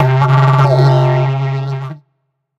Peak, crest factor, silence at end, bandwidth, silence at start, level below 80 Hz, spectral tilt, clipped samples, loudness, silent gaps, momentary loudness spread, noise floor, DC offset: 0 dBFS; 12 dB; 0.6 s; 6.6 kHz; 0 s; -50 dBFS; -8.5 dB/octave; under 0.1%; -12 LUFS; none; 13 LU; -67 dBFS; under 0.1%